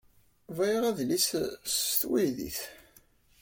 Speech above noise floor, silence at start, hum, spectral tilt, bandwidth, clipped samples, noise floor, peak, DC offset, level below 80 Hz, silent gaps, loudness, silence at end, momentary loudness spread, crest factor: 32 dB; 0.5 s; none; -3 dB/octave; 17 kHz; under 0.1%; -62 dBFS; -14 dBFS; under 0.1%; -62 dBFS; none; -29 LUFS; 0.65 s; 11 LU; 18 dB